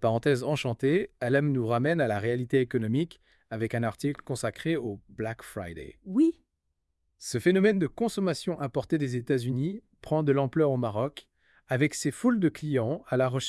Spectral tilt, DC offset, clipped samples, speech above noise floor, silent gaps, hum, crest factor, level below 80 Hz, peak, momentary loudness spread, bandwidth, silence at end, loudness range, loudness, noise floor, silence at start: -6.5 dB/octave; under 0.1%; under 0.1%; 52 dB; none; none; 18 dB; -62 dBFS; -10 dBFS; 10 LU; 12 kHz; 0 s; 4 LU; -28 LUFS; -79 dBFS; 0 s